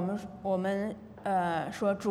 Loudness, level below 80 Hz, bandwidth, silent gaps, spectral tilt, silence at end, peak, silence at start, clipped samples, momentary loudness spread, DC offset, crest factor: -32 LUFS; -66 dBFS; 13.5 kHz; none; -6.5 dB/octave; 0 s; -18 dBFS; 0 s; under 0.1%; 7 LU; under 0.1%; 14 dB